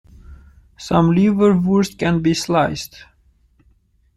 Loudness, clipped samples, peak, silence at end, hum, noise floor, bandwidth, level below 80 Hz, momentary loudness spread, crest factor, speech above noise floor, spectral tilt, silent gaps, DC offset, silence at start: -17 LUFS; under 0.1%; -2 dBFS; 1.3 s; none; -57 dBFS; 13 kHz; -44 dBFS; 13 LU; 16 dB; 41 dB; -6.5 dB/octave; none; under 0.1%; 0.3 s